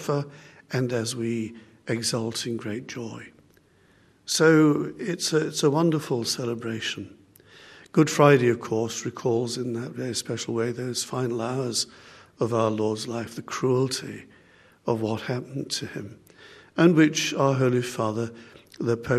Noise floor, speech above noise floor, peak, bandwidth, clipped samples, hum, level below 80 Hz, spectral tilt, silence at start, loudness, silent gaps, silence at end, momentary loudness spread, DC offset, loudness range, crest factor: -59 dBFS; 35 dB; -2 dBFS; 13.5 kHz; under 0.1%; none; -66 dBFS; -5 dB/octave; 0 s; -25 LUFS; none; 0 s; 16 LU; under 0.1%; 6 LU; 22 dB